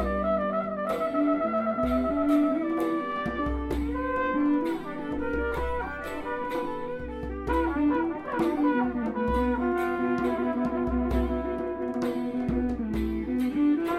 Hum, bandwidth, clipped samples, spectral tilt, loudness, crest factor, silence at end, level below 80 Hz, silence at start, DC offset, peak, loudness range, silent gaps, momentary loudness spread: none; 13.5 kHz; under 0.1%; -8 dB/octave; -28 LUFS; 14 dB; 0 s; -40 dBFS; 0 s; under 0.1%; -14 dBFS; 3 LU; none; 7 LU